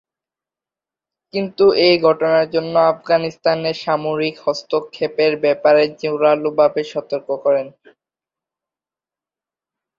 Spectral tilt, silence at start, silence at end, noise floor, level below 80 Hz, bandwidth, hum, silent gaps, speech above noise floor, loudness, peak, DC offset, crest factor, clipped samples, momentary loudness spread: -6 dB/octave; 1.35 s; 2.3 s; -90 dBFS; -62 dBFS; 7.4 kHz; none; none; 73 dB; -17 LUFS; -2 dBFS; under 0.1%; 16 dB; under 0.1%; 10 LU